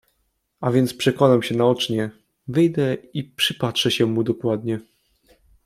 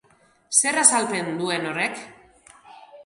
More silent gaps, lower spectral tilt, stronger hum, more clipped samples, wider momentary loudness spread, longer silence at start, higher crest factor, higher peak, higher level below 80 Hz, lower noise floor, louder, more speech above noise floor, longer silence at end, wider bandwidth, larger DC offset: neither; first, -5.5 dB/octave vs -1.5 dB/octave; neither; neither; about the same, 11 LU vs 11 LU; about the same, 0.6 s vs 0.5 s; about the same, 20 dB vs 24 dB; about the same, -2 dBFS vs 0 dBFS; first, -60 dBFS vs -70 dBFS; first, -71 dBFS vs -58 dBFS; about the same, -21 LUFS vs -20 LUFS; first, 50 dB vs 35 dB; first, 0.85 s vs 0.05 s; about the same, 15.5 kHz vs 15 kHz; neither